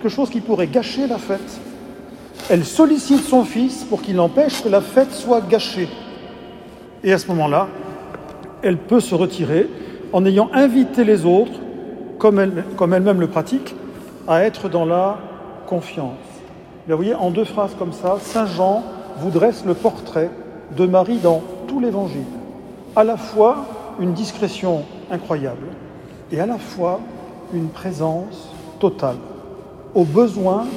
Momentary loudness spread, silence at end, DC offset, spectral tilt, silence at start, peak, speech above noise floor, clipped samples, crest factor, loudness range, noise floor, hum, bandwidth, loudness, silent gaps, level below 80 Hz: 20 LU; 0 s; under 0.1%; -6.5 dB/octave; 0 s; 0 dBFS; 21 dB; under 0.1%; 18 dB; 8 LU; -38 dBFS; none; 16 kHz; -18 LUFS; none; -54 dBFS